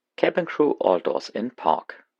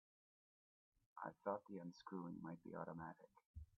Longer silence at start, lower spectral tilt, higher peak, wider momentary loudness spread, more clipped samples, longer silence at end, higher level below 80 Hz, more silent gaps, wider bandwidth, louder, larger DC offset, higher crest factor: second, 0.2 s vs 1.15 s; about the same, -6 dB/octave vs -6.5 dB/octave; first, -2 dBFS vs -32 dBFS; second, 7 LU vs 15 LU; neither; about the same, 0.25 s vs 0.15 s; about the same, -78 dBFS vs -74 dBFS; second, none vs 3.46-3.54 s; first, 7.8 kHz vs 4.5 kHz; first, -24 LUFS vs -52 LUFS; neither; about the same, 22 dB vs 22 dB